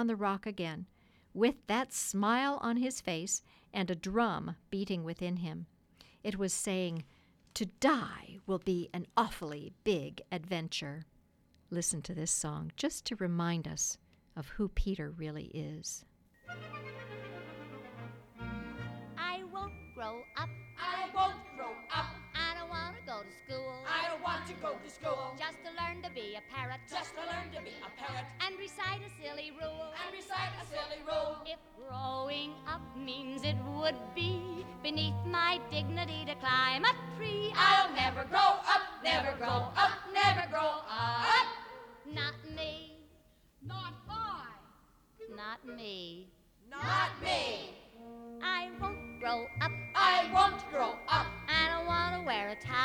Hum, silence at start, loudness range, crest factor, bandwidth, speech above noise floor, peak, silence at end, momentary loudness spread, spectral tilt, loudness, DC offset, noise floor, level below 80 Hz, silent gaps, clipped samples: none; 0 s; 12 LU; 22 dB; 20 kHz; 33 dB; -12 dBFS; 0 s; 17 LU; -3.5 dB/octave; -34 LUFS; under 0.1%; -68 dBFS; -56 dBFS; none; under 0.1%